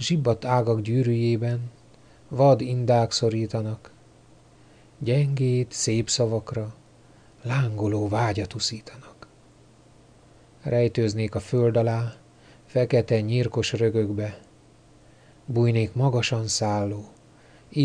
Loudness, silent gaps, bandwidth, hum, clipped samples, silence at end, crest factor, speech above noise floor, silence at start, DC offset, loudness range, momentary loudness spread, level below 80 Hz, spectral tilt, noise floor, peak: -24 LUFS; none; 10 kHz; none; under 0.1%; 0 s; 18 dB; 31 dB; 0 s; under 0.1%; 5 LU; 12 LU; -56 dBFS; -6 dB/octave; -54 dBFS; -8 dBFS